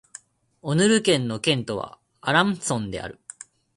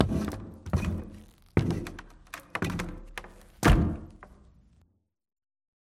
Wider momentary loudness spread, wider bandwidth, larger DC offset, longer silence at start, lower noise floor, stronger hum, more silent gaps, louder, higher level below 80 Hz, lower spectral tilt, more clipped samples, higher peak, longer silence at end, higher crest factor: second, 19 LU vs 22 LU; second, 11.5 kHz vs 16.5 kHz; neither; first, 0.65 s vs 0 s; second, -48 dBFS vs -67 dBFS; neither; neither; first, -23 LUFS vs -30 LUFS; second, -56 dBFS vs -36 dBFS; second, -4 dB/octave vs -6.5 dB/octave; neither; about the same, -4 dBFS vs -6 dBFS; second, 0.65 s vs 1.6 s; about the same, 20 dB vs 24 dB